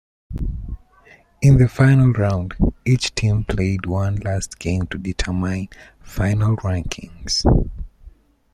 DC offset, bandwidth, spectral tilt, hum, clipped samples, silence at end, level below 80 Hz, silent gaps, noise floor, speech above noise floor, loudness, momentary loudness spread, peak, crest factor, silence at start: under 0.1%; 13 kHz; -6 dB/octave; none; under 0.1%; 0.45 s; -30 dBFS; none; -50 dBFS; 33 dB; -19 LUFS; 18 LU; -2 dBFS; 16 dB; 0.3 s